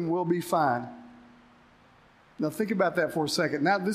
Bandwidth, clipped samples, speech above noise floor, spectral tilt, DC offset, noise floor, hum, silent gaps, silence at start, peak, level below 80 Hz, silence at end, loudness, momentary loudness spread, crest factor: 15.5 kHz; under 0.1%; 31 dB; -5 dB/octave; under 0.1%; -58 dBFS; none; none; 0 s; -12 dBFS; -70 dBFS; 0 s; -27 LUFS; 8 LU; 18 dB